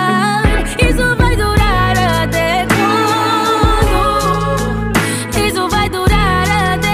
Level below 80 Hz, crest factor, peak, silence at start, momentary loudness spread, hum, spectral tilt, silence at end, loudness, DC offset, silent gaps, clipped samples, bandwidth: -20 dBFS; 12 dB; 0 dBFS; 0 s; 3 LU; none; -5 dB/octave; 0 s; -13 LUFS; under 0.1%; none; under 0.1%; 16 kHz